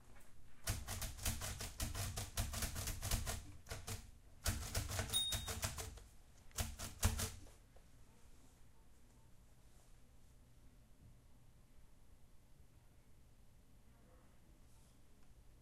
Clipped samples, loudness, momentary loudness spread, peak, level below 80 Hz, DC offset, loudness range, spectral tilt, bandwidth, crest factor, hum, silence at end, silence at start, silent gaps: under 0.1%; -44 LUFS; 26 LU; -20 dBFS; -52 dBFS; under 0.1%; 5 LU; -2.5 dB/octave; 16 kHz; 28 dB; none; 0 s; 0 s; none